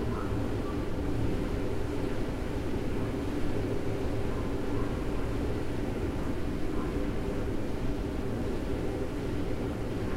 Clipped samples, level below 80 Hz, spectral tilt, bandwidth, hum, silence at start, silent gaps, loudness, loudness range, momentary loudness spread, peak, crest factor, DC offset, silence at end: under 0.1%; -36 dBFS; -7.5 dB/octave; 14.5 kHz; none; 0 s; none; -34 LUFS; 1 LU; 1 LU; -18 dBFS; 12 dB; under 0.1%; 0 s